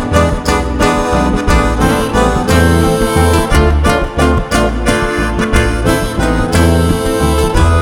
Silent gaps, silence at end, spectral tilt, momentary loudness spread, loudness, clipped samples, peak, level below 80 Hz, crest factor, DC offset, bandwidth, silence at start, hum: none; 0 s; -5.5 dB/octave; 3 LU; -12 LUFS; under 0.1%; 0 dBFS; -16 dBFS; 10 dB; 0.4%; 17 kHz; 0 s; none